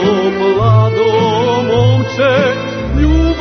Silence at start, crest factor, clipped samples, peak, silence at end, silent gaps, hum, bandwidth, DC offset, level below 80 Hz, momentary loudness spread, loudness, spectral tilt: 0 s; 10 dB; under 0.1%; 0 dBFS; 0 s; none; none; 6.4 kHz; under 0.1%; -22 dBFS; 4 LU; -12 LUFS; -7 dB/octave